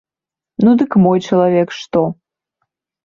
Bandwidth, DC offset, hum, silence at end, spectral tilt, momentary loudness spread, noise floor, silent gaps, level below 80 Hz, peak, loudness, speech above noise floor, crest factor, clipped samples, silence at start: 7.2 kHz; under 0.1%; none; 0.9 s; -8 dB/octave; 7 LU; -88 dBFS; none; -54 dBFS; -2 dBFS; -14 LUFS; 75 dB; 14 dB; under 0.1%; 0.6 s